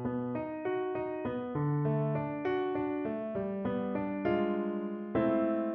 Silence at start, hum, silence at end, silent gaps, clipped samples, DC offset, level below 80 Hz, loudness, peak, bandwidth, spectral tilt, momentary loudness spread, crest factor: 0 s; none; 0 s; none; under 0.1%; under 0.1%; -64 dBFS; -33 LUFS; -18 dBFS; 5.2 kHz; -7.5 dB/octave; 5 LU; 14 dB